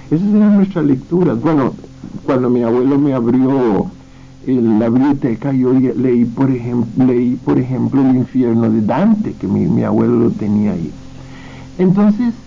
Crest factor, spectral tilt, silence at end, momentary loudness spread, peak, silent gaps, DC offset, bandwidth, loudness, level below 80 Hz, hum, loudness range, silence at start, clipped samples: 12 dB; -10 dB/octave; 0.05 s; 11 LU; -2 dBFS; none; under 0.1%; 7.2 kHz; -14 LUFS; -44 dBFS; none; 1 LU; 0 s; under 0.1%